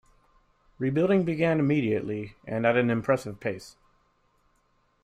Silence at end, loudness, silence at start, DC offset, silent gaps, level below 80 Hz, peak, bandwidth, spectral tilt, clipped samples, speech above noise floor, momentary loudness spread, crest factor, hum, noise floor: 1.35 s; -26 LUFS; 0.8 s; under 0.1%; none; -60 dBFS; -10 dBFS; 14 kHz; -7.5 dB/octave; under 0.1%; 43 dB; 11 LU; 18 dB; none; -68 dBFS